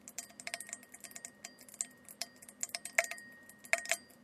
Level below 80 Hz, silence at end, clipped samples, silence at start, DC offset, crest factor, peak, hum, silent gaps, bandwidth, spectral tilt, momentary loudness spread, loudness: -86 dBFS; 0 s; under 0.1%; 0.05 s; under 0.1%; 32 dB; -10 dBFS; none; none; 14.5 kHz; 1 dB/octave; 16 LU; -39 LUFS